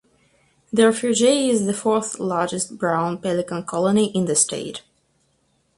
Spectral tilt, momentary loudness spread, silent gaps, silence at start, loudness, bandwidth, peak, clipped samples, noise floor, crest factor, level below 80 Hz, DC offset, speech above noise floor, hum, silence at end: -4 dB/octave; 8 LU; none; 0.75 s; -20 LUFS; 11.5 kHz; -4 dBFS; under 0.1%; -66 dBFS; 18 dB; -62 dBFS; under 0.1%; 45 dB; none; 1 s